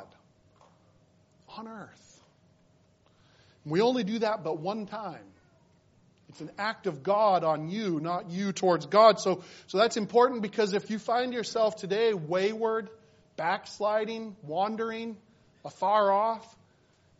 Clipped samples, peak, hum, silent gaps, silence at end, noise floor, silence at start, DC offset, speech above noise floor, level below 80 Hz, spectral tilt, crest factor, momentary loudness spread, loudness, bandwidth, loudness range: under 0.1%; -6 dBFS; none; none; 0.75 s; -64 dBFS; 0 s; under 0.1%; 36 dB; -76 dBFS; -3.5 dB/octave; 22 dB; 20 LU; -28 LUFS; 8 kHz; 7 LU